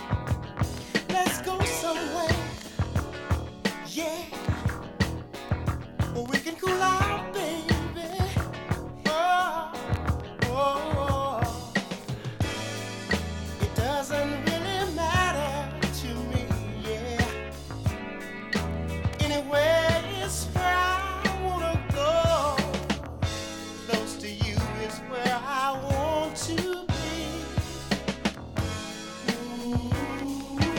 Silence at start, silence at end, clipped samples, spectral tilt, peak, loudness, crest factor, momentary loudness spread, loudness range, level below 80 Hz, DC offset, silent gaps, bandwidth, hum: 0 s; 0 s; under 0.1%; -5 dB/octave; -10 dBFS; -29 LUFS; 18 dB; 9 LU; 5 LU; -40 dBFS; under 0.1%; none; 17.5 kHz; none